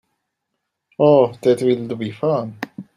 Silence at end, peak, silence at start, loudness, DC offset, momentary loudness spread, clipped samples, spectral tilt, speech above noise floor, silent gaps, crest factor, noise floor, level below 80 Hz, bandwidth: 0.15 s; -2 dBFS; 1 s; -18 LUFS; under 0.1%; 14 LU; under 0.1%; -7.5 dB/octave; 60 dB; none; 18 dB; -77 dBFS; -64 dBFS; 13 kHz